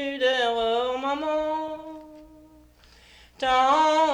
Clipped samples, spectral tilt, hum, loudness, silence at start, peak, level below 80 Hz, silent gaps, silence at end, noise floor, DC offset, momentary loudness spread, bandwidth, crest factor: under 0.1%; -2.5 dB/octave; 60 Hz at -65 dBFS; -24 LUFS; 0 s; -10 dBFS; -58 dBFS; none; 0 s; -54 dBFS; under 0.1%; 17 LU; 19 kHz; 16 dB